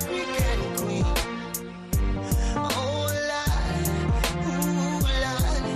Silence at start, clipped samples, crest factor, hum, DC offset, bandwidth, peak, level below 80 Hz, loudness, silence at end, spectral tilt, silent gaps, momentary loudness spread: 0 s; under 0.1%; 16 dB; none; under 0.1%; 15 kHz; -8 dBFS; -30 dBFS; -26 LUFS; 0 s; -5 dB/octave; none; 3 LU